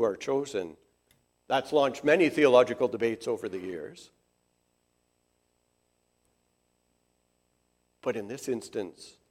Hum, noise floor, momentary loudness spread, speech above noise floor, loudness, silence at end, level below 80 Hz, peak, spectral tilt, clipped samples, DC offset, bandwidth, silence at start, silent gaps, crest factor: 60 Hz at -65 dBFS; -74 dBFS; 17 LU; 47 dB; -28 LUFS; 0.2 s; -74 dBFS; -8 dBFS; -5 dB/octave; under 0.1%; under 0.1%; 14.5 kHz; 0 s; none; 22 dB